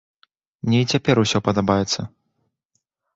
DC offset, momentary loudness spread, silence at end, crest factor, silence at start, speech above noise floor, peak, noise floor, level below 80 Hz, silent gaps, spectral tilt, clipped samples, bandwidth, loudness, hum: under 0.1%; 9 LU; 1.1 s; 20 dB; 0.65 s; 55 dB; -4 dBFS; -74 dBFS; -50 dBFS; none; -5 dB/octave; under 0.1%; 8 kHz; -20 LUFS; none